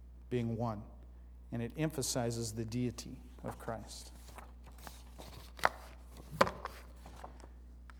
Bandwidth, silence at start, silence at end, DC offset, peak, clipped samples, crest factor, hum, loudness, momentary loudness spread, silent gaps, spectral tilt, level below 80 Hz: over 20 kHz; 0 s; 0 s; under 0.1%; -8 dBFS; under 0.1%; 32 dB; 60 Hz at -55 dBFS; -38 LUFS; 20 LU; none; -4.5 dB/octave; -54 dBFS